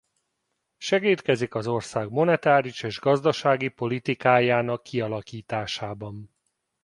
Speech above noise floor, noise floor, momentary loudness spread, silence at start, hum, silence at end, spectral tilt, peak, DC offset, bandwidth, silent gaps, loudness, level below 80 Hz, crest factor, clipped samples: 54 dB; -78 dBFS; 13 LU; 0.8 s; none; 0.55 s; -5.5 dB/octave; -4 dBFS; under 0.1%; 11.5 kHz; none; -24 LUFS; -62 dBFS; 22 dB; under 0.1%